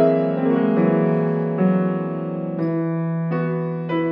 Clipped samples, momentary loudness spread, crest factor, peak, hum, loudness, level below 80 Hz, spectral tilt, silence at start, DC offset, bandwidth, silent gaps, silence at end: under 0.1%; 7 LU; 14 dB; -4 dBFS; none; -21 LUFS; -70 dBFS; -11.5 dB/octave; 0 s; under 0.1%; 4.3 kHz; none; 0 s